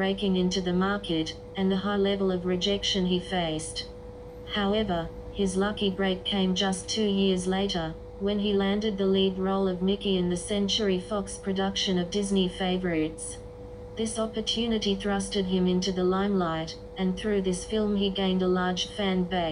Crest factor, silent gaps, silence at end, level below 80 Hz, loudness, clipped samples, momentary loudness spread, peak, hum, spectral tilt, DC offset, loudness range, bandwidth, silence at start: 14 dB; none; 0 s; -46 dBFS; -27 LUFS; under 0.1%; 8 LU; -14 dBFS; none; -5 dB/octave; under 0.1%; 2 LU; 11 kHz; 0 s